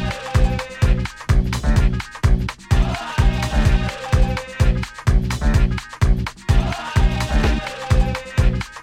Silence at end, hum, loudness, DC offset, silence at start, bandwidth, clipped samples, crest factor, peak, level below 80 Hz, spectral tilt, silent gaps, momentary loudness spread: 0 s; none; -20 LUFS; under 0.1%; 0 s; 13 kHz; under 0.1%; 14 dB; -4 dBFS; -20 dBFS; -6 dB/octave; none; 3 LU